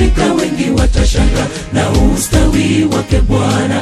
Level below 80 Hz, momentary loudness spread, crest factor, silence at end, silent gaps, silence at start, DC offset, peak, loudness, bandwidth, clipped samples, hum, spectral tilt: -16 dBFS; 3 LU; 12 dB; 0 s; none; 0 s; under 0.1%; 0 dBFS; -13 LUFS; 14 kHz; under 0.1%; none; -5.5 dB/octave